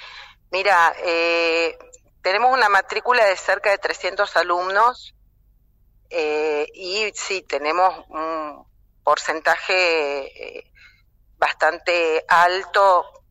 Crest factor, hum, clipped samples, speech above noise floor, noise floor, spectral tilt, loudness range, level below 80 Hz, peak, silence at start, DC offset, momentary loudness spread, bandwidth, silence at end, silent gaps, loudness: 16 dB; none; under 0.1%; 38 dB; -57 dBFS; -1.5 dB/octave; 5 LU; -58 dBFS; -6 dBFS; 0 s; under 0.1%; 11 LU; 15.5 kHz; 0.2 s; none; -19 LUFS